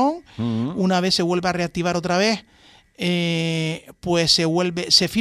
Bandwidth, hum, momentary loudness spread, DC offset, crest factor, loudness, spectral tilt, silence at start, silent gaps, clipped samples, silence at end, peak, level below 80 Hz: 14.5 kHz; none; 10 LU; under 0.1%; 18 dB; -20 LUFS; -4.5 dB/octave; 0 s; none; under 0.1%; 0 s; -2 dBFS; -52 dBFS